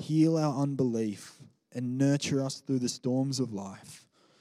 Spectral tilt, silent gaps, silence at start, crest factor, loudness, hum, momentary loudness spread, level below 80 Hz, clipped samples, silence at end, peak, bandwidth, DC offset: -6 dB/octave; none; 0 s; 16 dB; -30 LUFS; none; 18 LU; -78 dBFS; under 0.1%; 0.45 s; -14 dBFS; 14 kHz; under 0.1%